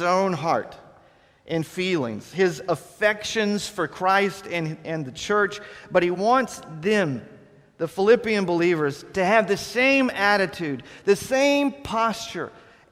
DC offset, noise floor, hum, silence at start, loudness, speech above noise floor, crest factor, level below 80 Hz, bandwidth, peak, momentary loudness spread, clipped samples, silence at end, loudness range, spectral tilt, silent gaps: under 0.1%; -56 dBFS; none; 0 s; -23 LUFS; 33 dB; 20 dB; -58 dBFS; 15.5 kHz; -4 dBFS; 11 LU; under 0.1%; 0.4 s; 4 LU; -5 dB/octave; none